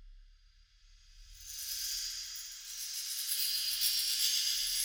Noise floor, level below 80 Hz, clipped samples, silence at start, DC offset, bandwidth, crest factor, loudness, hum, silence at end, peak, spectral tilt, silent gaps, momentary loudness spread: -63 dBFS; -62 dBFS; under 0.1%; 0 s; under 0.1%; over 20 kHz; 20 dB; -32 LUFS; none; 0 s; -16 dBFS; 4.5 dB/octave; none; 13 LU